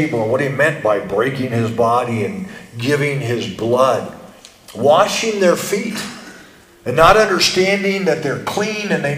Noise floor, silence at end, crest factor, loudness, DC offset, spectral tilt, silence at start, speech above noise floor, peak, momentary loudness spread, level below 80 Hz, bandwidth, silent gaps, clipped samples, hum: -43 dBFS; 0 s; 16 dB; -16 LUFS; under 0.1%; -4.5 dB/octave; 0 s; 27 dB; 0 dBFS; 12 LU; -44 dBFS; 16 kHz; none; under 0.1%; none